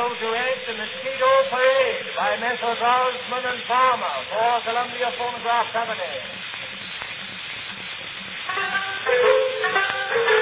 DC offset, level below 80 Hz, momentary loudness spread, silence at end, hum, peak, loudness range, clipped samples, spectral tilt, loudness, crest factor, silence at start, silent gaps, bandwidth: under 0.1%; -64 dBFS; 12 LU; 0 s; none; -4 dBFS; 7 LU; under 0.1%; -6 dB/octave; -23 LUFS; 18 dB; 0 s; none; 4 kHz